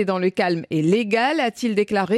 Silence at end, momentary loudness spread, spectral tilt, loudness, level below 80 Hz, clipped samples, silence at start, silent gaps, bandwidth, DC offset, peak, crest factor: 0 s; 3 LU; -6 dB/octave; -21 LUFS; -64 dBFS; under 0.1%; 0 s; none; 13.5 kHz; under 0.1%; -6 dBFS; 14 dB